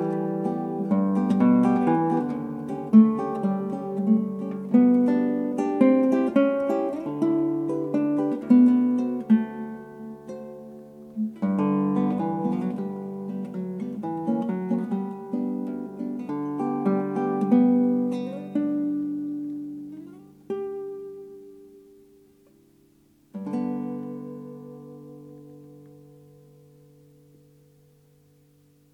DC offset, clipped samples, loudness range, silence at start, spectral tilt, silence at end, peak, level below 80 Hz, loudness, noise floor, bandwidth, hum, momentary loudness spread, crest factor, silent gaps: under 0.1%; under 0.1%; 14 LU; 0 s; -9.5 dB/octave; 3.05 s; -6 dBFS; -72 dBFS; -24 LUFS; -60 dBFS; 6.2 kHz; none; 20 LU; 20 dB; none